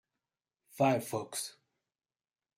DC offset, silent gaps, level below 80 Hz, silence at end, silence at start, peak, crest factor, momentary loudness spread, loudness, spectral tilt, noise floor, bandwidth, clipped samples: under 0.1%; none; -80 dBFS; 1.05 s; 0.75 s; -16 dBFS; 20 dB; 10 LU; -34 LUFS; -5 dB/octave; under -90 dBFS; 16 kHz; under 0.1%